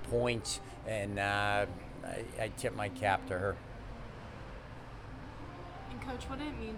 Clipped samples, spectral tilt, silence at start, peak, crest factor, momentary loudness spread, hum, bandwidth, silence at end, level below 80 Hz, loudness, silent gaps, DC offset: under 0.1%; -4.5 dB/octave; 0 s; -16 dBFS; 22 dB; 15 LU; none; 18 kHz; 0 s; -50 dBFS; -37 LUFS; none; under 0.1%